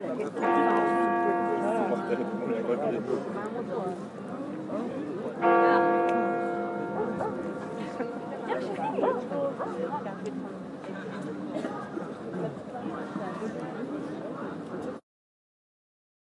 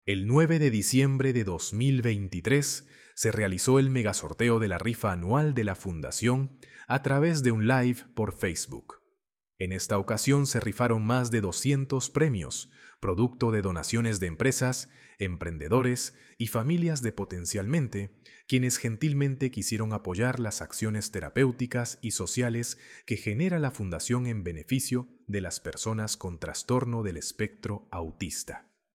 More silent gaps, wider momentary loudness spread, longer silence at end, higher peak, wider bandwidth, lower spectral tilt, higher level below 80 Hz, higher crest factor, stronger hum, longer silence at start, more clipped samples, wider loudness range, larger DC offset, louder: neither; about the same, 13 LU vs 11 LU; first, 1.3 s vs 0.35 s; about the same, -10 dBFS vs -10 dBFS; second, 11 kHz vs 16.5 kHz; first, -7 dB/octave vs -5 dB/octave; second, -74 dBFS vs -54 dBFS; about the same, 20 dB vs 18 dB; neither; about the same, 0 s vs 0.05 s; neither; first, 9 LU vs 4 LU; neither; about the same, -30 LUFS vs -29 LUFS